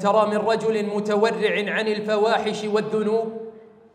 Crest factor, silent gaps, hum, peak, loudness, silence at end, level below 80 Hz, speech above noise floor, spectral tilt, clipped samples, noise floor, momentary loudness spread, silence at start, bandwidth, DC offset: 16 dB; none; none; -6 dBFS; -22 LUFS; 0.35 s; -72 dBFS; 21 dB; -5 dB/octave; under 0.1%; -42 dBFS; 5 LU; 0 s; 10.5 kHz; under 0.1%